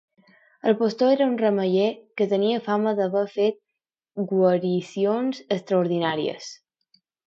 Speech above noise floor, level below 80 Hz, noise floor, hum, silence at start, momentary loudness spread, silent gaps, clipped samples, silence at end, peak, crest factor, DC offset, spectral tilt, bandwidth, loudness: 62 dB; -76 dBFS; -85 dBFS; none; 0.65 s; 8 LU; none; under 0.1%; 0.75 s; -6 dBFS; 18 dB; under 0.1%; -6.5 dB/octave; 7.8 kHz; -23 LUFS